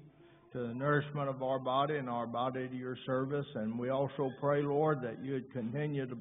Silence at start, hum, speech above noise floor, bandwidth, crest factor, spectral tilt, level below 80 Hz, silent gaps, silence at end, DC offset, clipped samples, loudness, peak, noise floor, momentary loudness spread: 0 s; none; 25 dB; 3.8 kHz; 16 dB; -4.5 dB/octave; -74 dBFS; none; 0 s; under 0.1%; under 0.1%; -35 LUFS; -18 dBFS; -60 dBFS; 8 LU